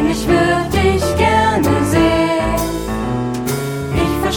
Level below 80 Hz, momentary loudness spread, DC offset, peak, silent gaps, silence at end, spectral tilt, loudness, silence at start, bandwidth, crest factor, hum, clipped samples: -28 dBFS; 7 LU; 0.2%; -2 dBFS; none; 0 s; -5.5 dB/octave; -16 LUFS; 0 s; 17.5 kHz; 14 dB; none; under 0.1%